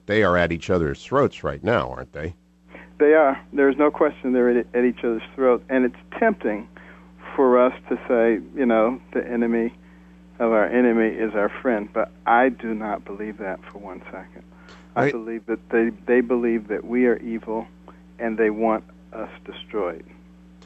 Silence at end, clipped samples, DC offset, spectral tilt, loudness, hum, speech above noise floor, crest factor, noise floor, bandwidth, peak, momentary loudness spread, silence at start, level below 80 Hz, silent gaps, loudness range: 0.65 s; under 0.1%; under 0.1%; -7.5 dB/octave; -22 LUFS; none; 26 dB; 16 dB; -48 dBFS; 8 kHz; -6 dBFS; 15 LU; 0.1 s; -50 dBFS; none; 5 LU